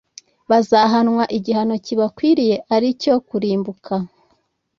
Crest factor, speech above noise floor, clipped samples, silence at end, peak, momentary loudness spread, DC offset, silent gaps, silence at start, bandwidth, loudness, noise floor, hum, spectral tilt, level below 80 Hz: 16 dB; 47 dB; under 0.1%; 0.7 s; -2 dBFS; 10 LU; under 0.1%; none; 0.5 s; 7.2 kHz; -18 LUFS; -64 dBFS; none; -6 dB/octave; -60 dBFS